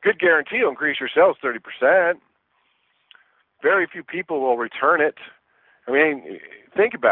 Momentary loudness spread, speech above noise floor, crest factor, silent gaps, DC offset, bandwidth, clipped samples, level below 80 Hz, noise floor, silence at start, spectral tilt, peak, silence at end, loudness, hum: 12 LU; 47 dB; 18 dB; none; under 0.1%; 4.1 kHz; under 0.1%; -72 dBFS; -67 dBFS; 0 s; -8 dB/octave; -4 dBFS; 0 s; -20 LUFS; none